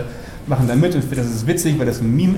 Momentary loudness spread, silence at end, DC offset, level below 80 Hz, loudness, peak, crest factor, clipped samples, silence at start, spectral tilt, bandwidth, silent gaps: 8 LU; 0 s; under 0.1%; -38 dBFS; -18 LUFS; -4 dBFS; 12 dB; under 0.1%; 0 s; -6.5 dB/octave; 16.5 kHz; none